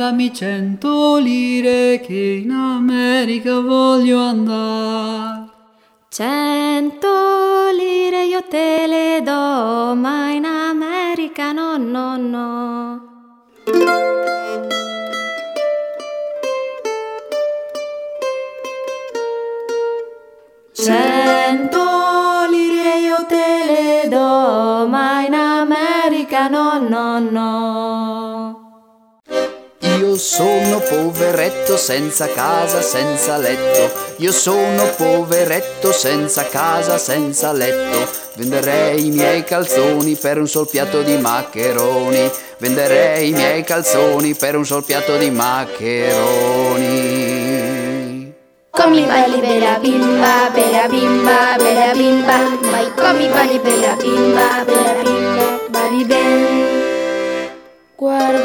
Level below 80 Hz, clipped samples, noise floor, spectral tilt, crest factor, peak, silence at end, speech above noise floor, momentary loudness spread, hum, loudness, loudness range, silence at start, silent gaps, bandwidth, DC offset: -60 dBFS; under 0.1%; -53 dBFS; -3.5 dB/octave; 16 dB; 0 dBFS; 0 s; 39 dB; 10 LU; none; -15 LUFS; 7 LU; 0 s; none; over 20 kHz; under 0.1%